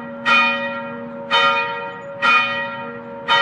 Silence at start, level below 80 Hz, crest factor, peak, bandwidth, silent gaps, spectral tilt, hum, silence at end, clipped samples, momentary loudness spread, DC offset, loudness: 0 s; -66 dBFS; 16 dB; -4 dBFS; 10.5 kHz; none; -3 dB/octave; none; 0 s; under 0.1%; 16 LU; under 0.1%; -17 LUFS